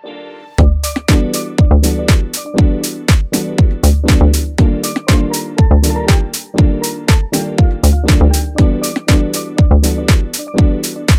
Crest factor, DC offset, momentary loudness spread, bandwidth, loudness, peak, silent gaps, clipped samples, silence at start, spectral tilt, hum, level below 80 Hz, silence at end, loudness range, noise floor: 12 dB; under 0.1%; 6 LU; 16.5 kHz; -13 LUFS; 0 dBFS; none; under 0.1%; 0.05 s; -5.5 dB/octave; none; -14 dBFS; 0 s; 1 LU; -32 dBFS